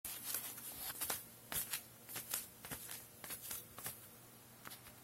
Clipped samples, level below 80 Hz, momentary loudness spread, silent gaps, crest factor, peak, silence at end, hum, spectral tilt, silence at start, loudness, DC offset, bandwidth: under 0.1%; -72 dBFS; 13 LU; none; 32 dB; -18 dBFS; 0 s; none; -1 dB/octave; 0.05 s; -45 LUFS; under 0.1%; 16.5 kHz